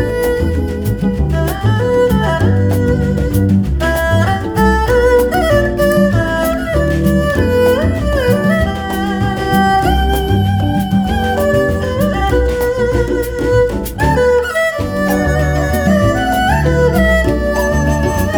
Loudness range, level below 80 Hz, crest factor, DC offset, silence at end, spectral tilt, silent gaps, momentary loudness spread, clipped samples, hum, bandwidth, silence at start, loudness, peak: 2 LU; -22 dBFS; 12 dB; under 0.1%; 0 s; -6.5 dB/octave; none; 4 LU; under 0.1%; none; over 20 kHz; 0 s; -14 LUFS; 0 dBFS